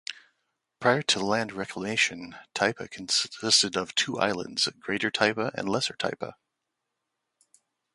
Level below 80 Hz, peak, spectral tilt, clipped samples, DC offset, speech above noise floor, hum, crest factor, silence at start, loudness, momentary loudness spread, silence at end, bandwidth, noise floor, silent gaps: -66 dBFS; -6 dBFS; -2.5 dB/octave; under 0.1%; under 0.1%; 55 dB; none; 24 dB; 0.1 s; -26 LUFS; 12 LU; 1.6 s; 11.5 kHz; -83 dBFS; none